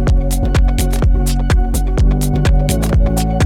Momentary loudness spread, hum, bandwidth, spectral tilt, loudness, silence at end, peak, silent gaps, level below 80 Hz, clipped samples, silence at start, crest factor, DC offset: 2 LU; none; 16 kHz; -6 dB/octave; -15 LUFS; 0 s; -2 dBFS; none; -14 dBFS; under 0.1%; 0 s; 10 dB; under 0.1%